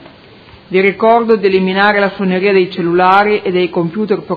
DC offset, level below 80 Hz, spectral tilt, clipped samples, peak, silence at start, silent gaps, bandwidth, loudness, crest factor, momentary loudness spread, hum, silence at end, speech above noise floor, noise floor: under 0.1%; -52 dBFS; -8.5 dB/octave; 0.2%; 0 dBFS; 0.7 s; none; 5.4 kHz; -12 LUFS; 12 dB; 6 LU; none; 0 s; 28 dB; -39 dBFS